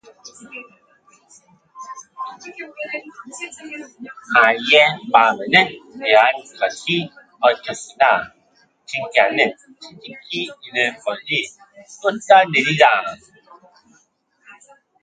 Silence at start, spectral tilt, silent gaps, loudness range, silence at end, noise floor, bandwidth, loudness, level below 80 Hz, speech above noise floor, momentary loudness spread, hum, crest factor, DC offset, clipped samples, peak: 0.25 s; -3.5 dB/octave; none; 18 LU; 1.9 s; -61 dBFS; 9.4 kHz; -17 LUFS; -66 dBFS; 43 dB; 23 LU; none; 20 dB; under 0.1%; under 0.1%; 0 dBFS